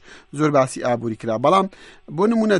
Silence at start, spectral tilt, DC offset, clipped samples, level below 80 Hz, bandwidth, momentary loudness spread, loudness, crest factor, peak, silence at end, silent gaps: 0.1 s; -6 dB/octave; under 0.1%; under 0.1%; -56 dBFS; 11.5 kHz; 11 LU; -20 LUFS; 16 dB; -4 dBFS; 0 s; none